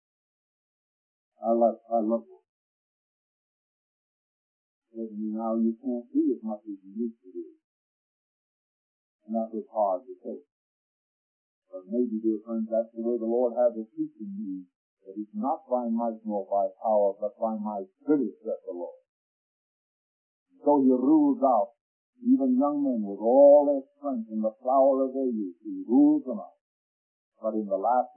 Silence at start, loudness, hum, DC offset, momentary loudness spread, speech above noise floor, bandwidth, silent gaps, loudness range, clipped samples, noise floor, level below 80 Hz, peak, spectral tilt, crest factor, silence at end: 1.4 s; -26 LUFS; none; under 0.1%; 16 LU; over 64 dB; 1.6 kHz; 2.49-4.82 s, 7.64-9.19 s, 10.52-11.62 s, 14.75-14.97 s, 19.09-20.46 s, 21.81-22.13 s, 26.61-27.32 s; 12 LU; under 0.1%; under -90 dBFS; under -90 dBFS; -8 dBFS; -14 dB/octave; 20 dB; 0.1 s